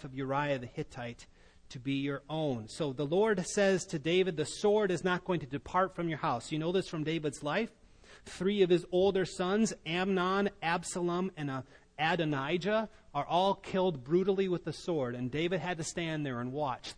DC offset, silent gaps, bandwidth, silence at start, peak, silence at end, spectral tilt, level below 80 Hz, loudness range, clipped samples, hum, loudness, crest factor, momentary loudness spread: under 0.1%; none; 10.5 kHz; 0 s; -16 dBFS; 0.05 s; -5.5 dB/octave; -60 dBFS; 3 LU; under 0.1%; none; -32 LUFS; 16 dB; 8 LU